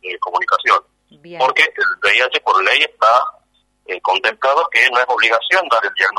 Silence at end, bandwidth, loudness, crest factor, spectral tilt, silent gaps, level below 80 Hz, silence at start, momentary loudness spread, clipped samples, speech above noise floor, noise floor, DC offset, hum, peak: 0 s; 12 kHz; -14 LUFS; 16 dB; -0.5 dB/octave; none; -66 dBFS; 0.05 s; 6 LU; under 0.1%; 44 dB; -59 dBFS; under 0.1%; 50 Hz at -70 dBFS; 0 dBFS